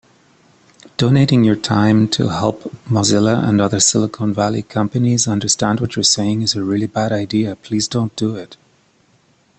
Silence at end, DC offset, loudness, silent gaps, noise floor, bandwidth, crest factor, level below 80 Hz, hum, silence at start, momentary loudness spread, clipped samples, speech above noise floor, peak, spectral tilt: 1.05 s; under 0.1%; -16 LUFS; none; -56 dBFS; 9 kHz; 16 dB; -50 dBFS; none; 1 s; 7 LU; under 0.1%; 40 dB; 0 dBFS; -4.5 dB/octave